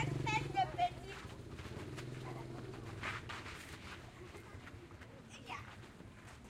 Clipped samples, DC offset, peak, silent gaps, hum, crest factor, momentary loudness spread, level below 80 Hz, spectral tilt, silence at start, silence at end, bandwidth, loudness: under 0.1%; under 0.1%; -24 dBFS; none; none; 20 dB; 18 LU; -60 dBFS; -5 dB/octave; 0 s; 0 s; 16 kHz; -44 LUFS